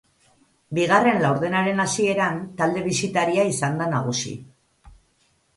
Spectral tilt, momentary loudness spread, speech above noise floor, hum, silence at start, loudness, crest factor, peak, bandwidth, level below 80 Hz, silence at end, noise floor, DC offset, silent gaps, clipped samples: -4.5 dB/octave; 8 LU; 43 dB; none; 0.7 s; -22 LUFS; 18 dB; -4 dBFS; 11.5 kHz; -58 dBFS; 0.7 s; -65 dBFS; under 0.1%; none; under 0.1%